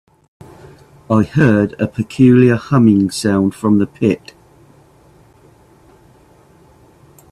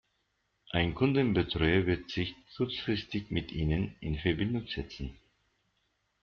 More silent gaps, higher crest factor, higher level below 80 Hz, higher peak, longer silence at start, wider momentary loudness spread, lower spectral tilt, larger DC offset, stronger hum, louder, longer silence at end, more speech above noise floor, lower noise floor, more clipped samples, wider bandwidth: neither; about the same, 16 dB vs 18 dB; about the same, -50 dBFS vs -48 dBFS; first, 0 dBFS vs -14 dBFS; first, 1.1 s vs 0.75 s; second, 8 LU vs 11 LU; first, -7.5 dB/octave vs -5 dB/octave; neither; neither; first, -14 LUFS vs -32 LUFS; first, 3.15 s vs 1.1 s; second, 35 dB vs 47 dB; second, -48 dBFS vs -78 dBFS; neither; first, 13 kHz vs 6.8 kHz